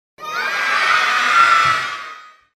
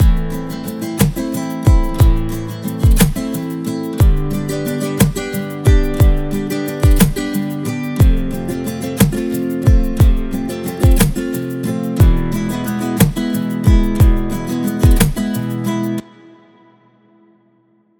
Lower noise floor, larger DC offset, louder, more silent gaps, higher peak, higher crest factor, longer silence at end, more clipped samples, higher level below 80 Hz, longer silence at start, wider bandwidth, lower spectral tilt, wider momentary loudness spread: second, -38 dBFS vs -56 dBFS; neither; about the same, -15 LUFS vs -17 LUFS; neither; about the same, 0 dBFS vs 0 dBFS; about the same, 16 dB vs 14 dB; second, 0.3 s vs 1.95 s; neither; second, -60 dBFS vs -18 dBFS; first, 0.2 s vs 0 s; second, 15 kHz vs 19 kHz; second, -0.5 dB/octave vs -6.5 dB/octave; first, 15 LU vs 9 LU